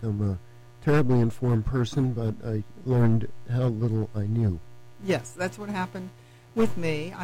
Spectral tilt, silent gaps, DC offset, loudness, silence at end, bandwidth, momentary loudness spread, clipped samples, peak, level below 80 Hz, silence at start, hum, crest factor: -7.5 dB/octave; none; under 0.1%; -27 LUFS; 0 s; 11.5 kHz; 11 LU; under 0.1%; -14 dBFS; -46 dBFS; 0 s; none; 12 dB